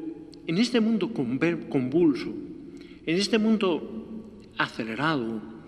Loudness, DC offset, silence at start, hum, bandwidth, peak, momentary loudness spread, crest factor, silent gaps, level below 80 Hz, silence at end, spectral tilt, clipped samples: -26 LUFS; under 0.1%; 0 s; none; 11 kHz; -8 dBFS; 17 LU; 18 dB; none; -60 dBFS; 0 s; -5.5 dB/octave; under 0.1%